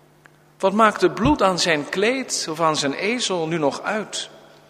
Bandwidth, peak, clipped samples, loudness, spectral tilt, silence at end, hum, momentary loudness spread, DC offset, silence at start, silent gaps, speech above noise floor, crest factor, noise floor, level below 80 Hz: 15.5 kHz; 0 dBFS; under 0.1%; -20 LUFS; -3.5 dB/octave; 0.3 s; none; 9 LU; under 0.1%; 0.6 s; none; 32 dB; 22 dB; -52 dBFS; -46 dBFS